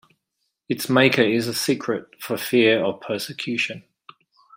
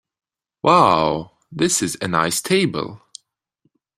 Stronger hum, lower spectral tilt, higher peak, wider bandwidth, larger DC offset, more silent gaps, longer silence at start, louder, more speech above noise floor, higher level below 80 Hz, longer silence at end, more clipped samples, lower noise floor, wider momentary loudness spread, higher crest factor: neither; about the same, -4.5 dB/octave vs -4 dB/octave; about the same, -2 dBFS vs -2 dBFS; about the same, 16 kHz vs 16 kHz; neither; neither; about the same, 0.7 s vs 0.65 s; second, -21 LUFS vs -18 LUFS; first, 55 dB vs 50 dB; second, -66 dBFS vs -54 dBFS; second, 0.75 s vs 1 s; neither; first, -76 dBFS vs -68 dBFS; about the same, 12 LU vs 14 LU; about the same, 20 dB vs 20 dB